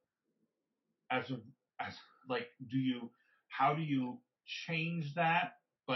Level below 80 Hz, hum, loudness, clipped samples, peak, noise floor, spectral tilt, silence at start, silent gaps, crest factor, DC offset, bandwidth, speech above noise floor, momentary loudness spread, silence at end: -90 dBFS; none; -37 LUFS; under 0.1%; -20 dBFS; -87 dBFS; -4 dB/octave; 1.1 s; none; 20 dB; under 0.1%; 6 kHz; 50 dB; 15 LU; 0 s